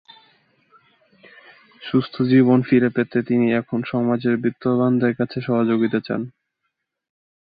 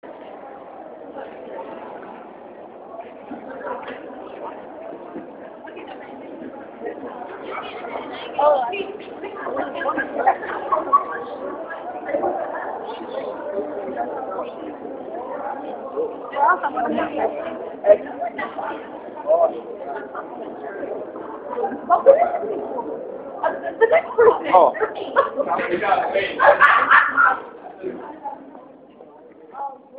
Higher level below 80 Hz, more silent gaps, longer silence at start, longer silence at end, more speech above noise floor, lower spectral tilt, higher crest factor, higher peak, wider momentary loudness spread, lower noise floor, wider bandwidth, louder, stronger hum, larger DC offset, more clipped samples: about the same, -62 dBFS vs -64 dBFS; neither; first, 1.8 s vs 0.05 s; first, 1.2 s vs 0 s; first, 58 dB vs 27 dB; first, -11 dB/octave vs -6.5 dB/octave; second, 16 dB vs 22 dB; second, -4 dBFS vs 0 dBFS; second, 9 LU vs 21 LU; first, -77 dBFS vs -44 dBFS; about the same, 5 kHz vs 4.9 kHz; about the same, -20 LUFS vs -21 LUFS; neither; neither; neither